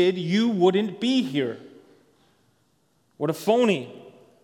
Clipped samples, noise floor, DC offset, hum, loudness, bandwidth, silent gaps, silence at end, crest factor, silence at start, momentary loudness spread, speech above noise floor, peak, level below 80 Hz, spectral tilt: under 0.1%; -67 dBFS; under 0.1%; none; -23 LUFS; 16 kHz; none; 0.35 s; 18 dB; 0 s; 10 LU; 44 dB; -8 dBFS; -78 dBFS; -6 dB/octave